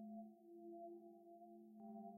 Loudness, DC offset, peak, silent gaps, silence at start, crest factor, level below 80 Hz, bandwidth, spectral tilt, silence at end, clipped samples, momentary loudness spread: -59 LUFS; under 0.1%; -46 dBFS; none; 0 s; 12 dB; under -90 dBFS; 15 kHz; -10 dB/octave; 0 s; under 0.1%; 6 LU